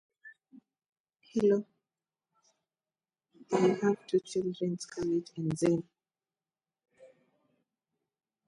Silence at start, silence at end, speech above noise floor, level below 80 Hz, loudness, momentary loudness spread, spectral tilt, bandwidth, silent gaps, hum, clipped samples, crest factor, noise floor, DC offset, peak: 0.25 s; 1.4 s; over 60 dB; -72 dBFS; -31 LUFS; 8 LU; -6.5 dB/octave; 11 kHz; 0.89-0.93 s, 1.00-1.04 s; none; under 0.1%; 20 dB; under -90 dBFS; under 0.1%; -14 dBFS